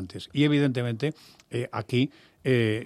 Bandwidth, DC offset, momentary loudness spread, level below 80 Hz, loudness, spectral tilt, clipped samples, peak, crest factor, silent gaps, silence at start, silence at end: 13 kHz; under 0.1%; 11 LU; -66 dBFS; -27 LUFS; -7 dB/octave; under 0.1%; -10 dBFS; 16 dB; none; 0 s; 0 s